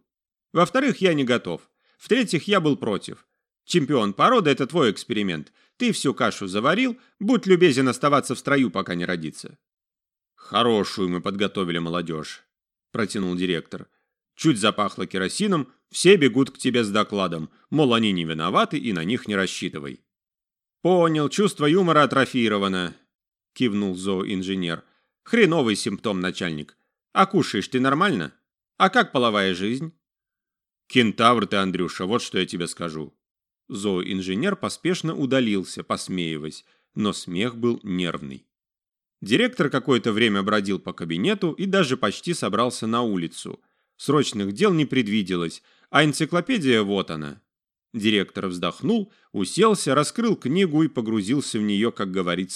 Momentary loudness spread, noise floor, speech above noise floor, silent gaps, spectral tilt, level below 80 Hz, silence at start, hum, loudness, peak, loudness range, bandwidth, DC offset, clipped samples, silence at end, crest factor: 12 LU; under -90 dBFS; over 68 dB; 23.15-23.19 s, 33.31-33.35 s; -5 dB/octave; -64 dBFS; 0.55 s; none; -22 LUFS; 0 dBFS; 5 LU; 13.5 kHz; under 0.1%; under 0.1%; 0 s; 22 dB